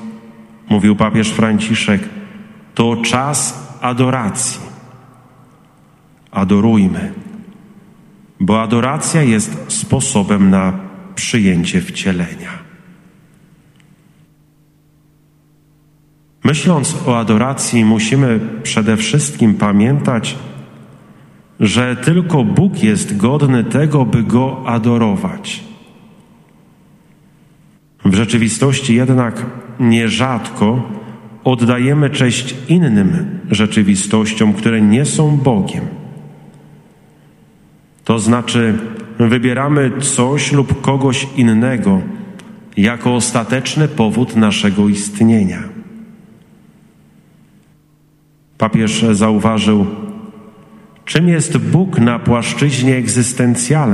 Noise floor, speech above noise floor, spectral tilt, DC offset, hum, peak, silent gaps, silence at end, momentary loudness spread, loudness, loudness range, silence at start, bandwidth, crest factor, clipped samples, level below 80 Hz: -51 dBFS; 38 dB; -5.5 dB/octave; under 0.1%; none; 0 dBFS; none; 0 s; 14 LU; -14 LUFS; 6 LU; 0 s; 12.5 kHz; 14 dB; under 0.1%; -48 dBFS